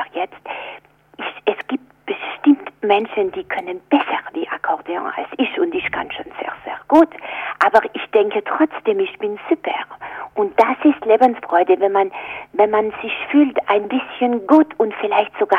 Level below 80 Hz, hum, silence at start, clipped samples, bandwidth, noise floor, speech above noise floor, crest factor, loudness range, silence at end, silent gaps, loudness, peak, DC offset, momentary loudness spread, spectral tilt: -60 dBFS; 50 Hz at -60 dBFS; 0 s; under 0.1%; 6.6 kHz; -41 dBFS; 23 dB; 16 dB; 4 LU; 0 s; none; -18 LUFS; -2 dBFS; under 0.1%; 13 LU; -6 dB/octave